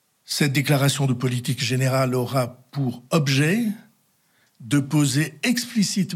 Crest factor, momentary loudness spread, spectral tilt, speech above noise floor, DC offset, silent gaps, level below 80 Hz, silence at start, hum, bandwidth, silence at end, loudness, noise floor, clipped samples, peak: 16 dB; 8 LU; -5 dB/octave; 42 dB; under 0.1%; none; -64 dBFS; 0.3 s; none; 16.5 kHz; 0 s; -22 LUFS; -64 dBFS; under 0.1%; -6 dBFS